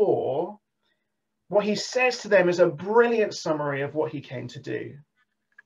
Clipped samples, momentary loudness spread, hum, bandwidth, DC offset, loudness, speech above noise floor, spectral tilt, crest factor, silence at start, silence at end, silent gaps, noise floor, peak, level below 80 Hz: under 0.1%; 15 LU; none; 11 kHz; under 0.1%; -24 LUFS; 57 dB; -5 dB/octave; 18 dB; 0 s; 0.65 s; none; -80 dBFS; -6 dBFS; -74 dBFS